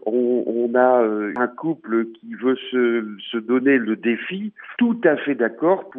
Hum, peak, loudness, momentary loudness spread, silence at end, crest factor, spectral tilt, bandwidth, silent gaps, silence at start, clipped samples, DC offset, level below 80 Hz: none; -4 dBFS; -21 LUFS; 10 LU; 0 s; 18 dB; -9 dB/octave; 3.8 kHz; none; 0.05 s; under 0.1%; under 0.1%; -80 dBFS